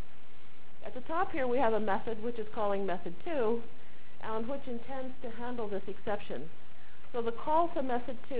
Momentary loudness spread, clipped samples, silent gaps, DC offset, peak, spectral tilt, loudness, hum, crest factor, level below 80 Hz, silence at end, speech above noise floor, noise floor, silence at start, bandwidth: 14 LU; under 0.1%; none; 4%; -16 dBFS; -9 dB/octave; -35 LUFS; none; 18 dB; -62 dBFS; 0 s; 24 dB; -58 dBFS; 0 s; 4 kHz